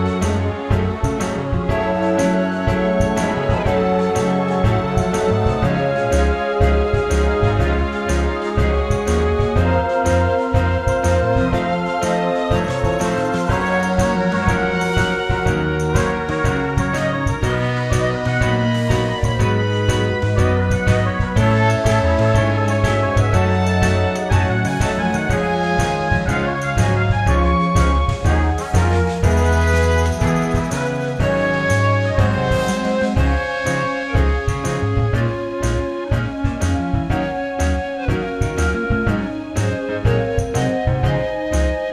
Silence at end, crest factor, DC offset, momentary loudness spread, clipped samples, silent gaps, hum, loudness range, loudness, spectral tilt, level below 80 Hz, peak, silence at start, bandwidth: 0 s; 16 dB; under 0.1%; 4 LU; under 0.1%; none; none; 3 LU; -18 LUFS; -6.5 dB/octave; -26 dBFS; -2 dBFS; 0 s; 13 kHz